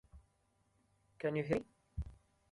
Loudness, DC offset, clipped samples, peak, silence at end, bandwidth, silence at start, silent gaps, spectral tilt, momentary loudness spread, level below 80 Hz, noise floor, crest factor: -41 LUFS; under 0.1%; under 0.1%; -20 dBFS; 0.4 s; 11.5 kHz; 0.15 s; none; -8 dB/octave; 14 LU; -56 dBFS; -77 dBFS; 24 dB